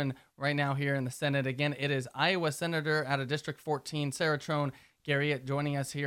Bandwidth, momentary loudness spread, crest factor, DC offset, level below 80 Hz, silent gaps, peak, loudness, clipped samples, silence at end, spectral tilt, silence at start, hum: 15.5 kHz; 6 LU; 18 dB; under 0.1%; -70 dBFS; none; -14 dBFS; -32 LUFS; under 0.1%; 0 s; -5.5 dB/octave; 0 s; none